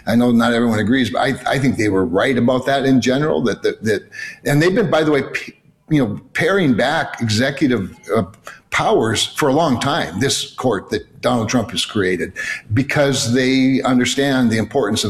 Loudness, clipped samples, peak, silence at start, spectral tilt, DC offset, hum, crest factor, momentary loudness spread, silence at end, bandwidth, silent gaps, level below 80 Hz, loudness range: -17 LUFS; under 0.1%; -6 dBFS; 0.05 s; -5 dB/octave; under 0.1%; none; 12 dB; 6 LU; 0 s; 14 kHz; none; -48 dBFS; 2 LU